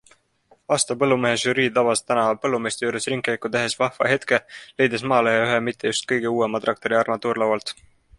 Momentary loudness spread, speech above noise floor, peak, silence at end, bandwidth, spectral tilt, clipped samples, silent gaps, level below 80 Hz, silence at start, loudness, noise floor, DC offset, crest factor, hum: 5 LU; 38 dB; -4 dBFS; 0.45 s; 11.5 kHz; -3.5 dB/octave; under 0.1%; none; -62 dBFS; 0.7 s; -21 LUFS; -60 dBFS; under 0.1%; 20 dB; none